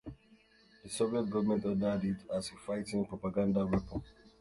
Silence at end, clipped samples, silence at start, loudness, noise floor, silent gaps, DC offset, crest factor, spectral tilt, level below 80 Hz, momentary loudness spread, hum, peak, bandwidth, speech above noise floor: 0.3 s; under 0.1%; 0.05 s; -35 LUFS; -64 dBFS; none; under 0.1%; 16 dB; -6.5 dB/octave; -56 dBFS; 10 LU; none; -18 dBFS; 11.5 kHz; 31 dB